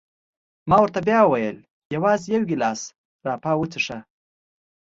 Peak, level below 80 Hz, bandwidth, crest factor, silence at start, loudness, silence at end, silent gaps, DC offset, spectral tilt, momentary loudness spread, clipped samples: -2 dBFS; -56 dBFS; 8 kHz; 20 dB; 0.65 s; -21 LUFS; 0.95 s; 1.70-1.90 s, 2.98-3.19 s; under 0.1%; -5.5 dB/octave; 17 LU; under 0.1%